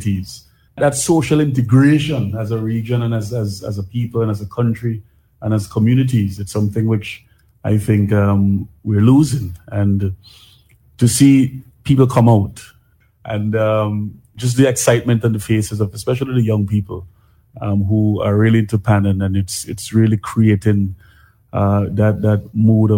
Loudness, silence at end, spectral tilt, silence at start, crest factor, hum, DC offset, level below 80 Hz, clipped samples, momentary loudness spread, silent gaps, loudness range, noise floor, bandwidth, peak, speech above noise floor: -16 LUFS; 0 s; -6.5 dB/octave; 0 s; 16 dB; none; under 0.1%; -46 dBFS; under 0.1%; 12 LU; none; 3 LU; -54 dBFS; 16.5 kHz; 0 dBFS; 39 dB